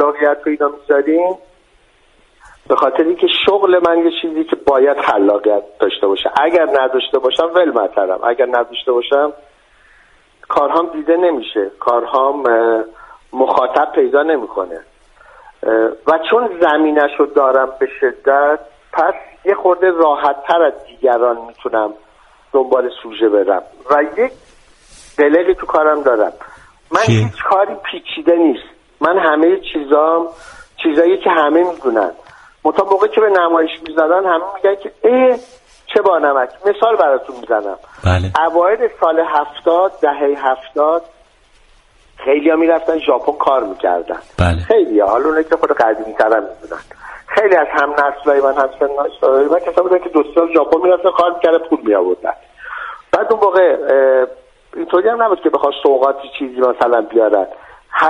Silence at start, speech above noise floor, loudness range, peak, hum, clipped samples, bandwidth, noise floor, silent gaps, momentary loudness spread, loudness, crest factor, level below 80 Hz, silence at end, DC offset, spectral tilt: 0 s; 38 dB; 3 LU; 0 dBFS; none; under 0.1%; 10.5 kHz; -52 dBFS; none; 8 LU; -14 LUFS; 14 dB; -44 dBFS; 0 s; under 0.1%; -6.5 dB/octave